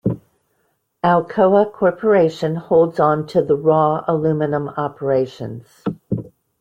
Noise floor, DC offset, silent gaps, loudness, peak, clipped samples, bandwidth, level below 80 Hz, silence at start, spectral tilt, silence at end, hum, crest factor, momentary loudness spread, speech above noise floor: -67 dBFS; under 0.1%; none; -18 LUFS; -2 dBFS; under 0.1%; 8.6 kHz; -56 dBFS; 0.05 s; -8.5 dB/octave; 0.3 s; none; 16 dB; 13 LU; 50 dB